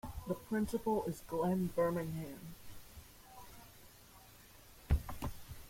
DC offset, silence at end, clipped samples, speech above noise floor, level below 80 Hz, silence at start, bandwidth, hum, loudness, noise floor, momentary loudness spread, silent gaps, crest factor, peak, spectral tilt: under 0.1%; 0 s; under 0.1%; 22 dB; -48 dBFS; 0.05 s; 16.5 kHz; none; -38 LUFS; -59 dBFS; 23 LU; none; 20 dB; -20 dBFS; -7 dB/octave